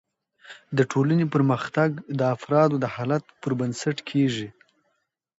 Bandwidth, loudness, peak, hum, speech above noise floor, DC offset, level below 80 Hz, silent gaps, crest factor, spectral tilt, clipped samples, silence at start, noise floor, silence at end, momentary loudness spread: 8 kHz; -24 LUFS; -6 dBFS; none; 51 dB; under 0.1%; -66 dBFS; none; 18 dB; -7 dB/octave; under 0.1%; 0.5 s; -75 dBFS; 0.9 s; 8 LU